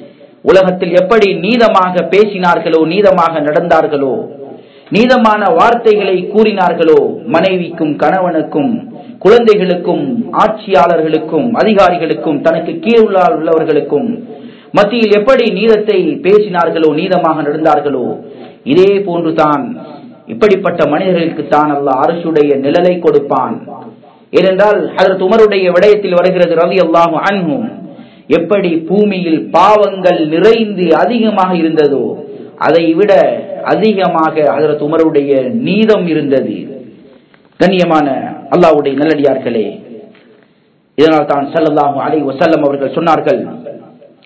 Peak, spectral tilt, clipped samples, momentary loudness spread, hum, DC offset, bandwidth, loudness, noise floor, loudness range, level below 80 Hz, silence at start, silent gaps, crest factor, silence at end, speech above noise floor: 0 dBFS; -7 dB/octave; 2%; 8 LU; none; under 0.1%; 8 kHz; -10 LUFS; -51 dBFS; 3 LU; -50 dBFS; 0 s; none; 10 dB; 0.4 s; 41 dB